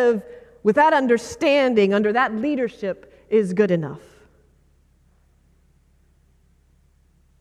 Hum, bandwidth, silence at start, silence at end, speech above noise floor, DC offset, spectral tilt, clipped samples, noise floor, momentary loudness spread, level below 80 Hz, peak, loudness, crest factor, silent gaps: none; 12 kHz; 0 s; 3.4 s; 39 dB; under 0.1%; -6 dB/octave; under 0.1%; -58 dBFS; 13 LU; -58 dBFS; -4 dBFS; -20 LUFS; 18 dB; none